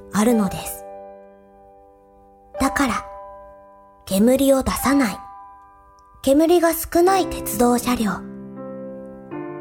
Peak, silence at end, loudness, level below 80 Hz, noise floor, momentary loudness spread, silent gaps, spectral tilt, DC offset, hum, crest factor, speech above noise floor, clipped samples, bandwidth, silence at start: -4 dBFS; 0 s; -19 LUFS; -44 dBFS; -50 dBFS; 21 LU; none; -4.5 dB/octave; under 0.1%; none; 18 dB; 32 dB; under 0.1%; 18 kHz; 0 s